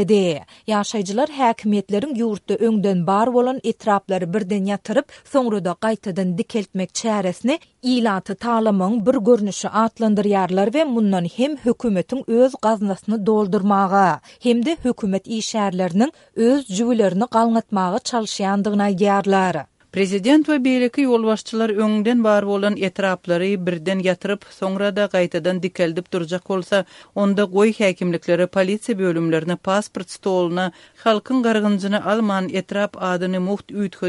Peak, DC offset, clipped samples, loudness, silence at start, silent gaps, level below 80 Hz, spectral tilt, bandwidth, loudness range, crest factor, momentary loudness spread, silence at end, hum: -4 dBFS; under 0.1%; under 0.1%; -20 LUFS; 0 s; none; -60 dBFS; -6 dB/octave; 11.5 kHz; 3 LU; 16 dB; 6 LU; 0 s; none